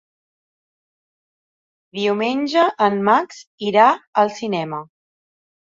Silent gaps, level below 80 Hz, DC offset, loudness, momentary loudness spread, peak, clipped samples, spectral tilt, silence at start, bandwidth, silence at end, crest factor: 3.47-3.58 s, 4.07-4.13 s; -70 dBFS; under 0.1%; -18 LUFS; 14 LU; -2 dBFS; under 0.1%; -5.5 dB/octave; 1.95 s; 7.8 kHz; 0.85 s; 20 dB